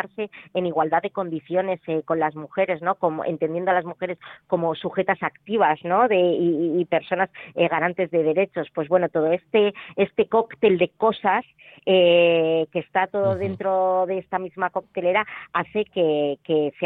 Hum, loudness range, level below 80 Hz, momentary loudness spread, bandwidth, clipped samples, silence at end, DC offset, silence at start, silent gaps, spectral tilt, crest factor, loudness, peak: none; 4 LU; -64 dBFS; 8 LU; 4.1 kHz; under 0.1%; 0 s; under 0.1%; 0 s; none; -9 dB/octave; 16 dB; -22 LUFS; -6 dBFS